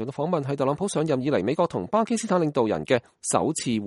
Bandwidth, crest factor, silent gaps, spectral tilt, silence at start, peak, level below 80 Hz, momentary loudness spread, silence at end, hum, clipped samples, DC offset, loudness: 11.5 kHz; 18 dB; none; -5.5 dB/octave; 0 s; -6 dBFS; -62 dBFS; 3 LU; 0 s; none; under 0.1%; under 0.1%; -25 LUFS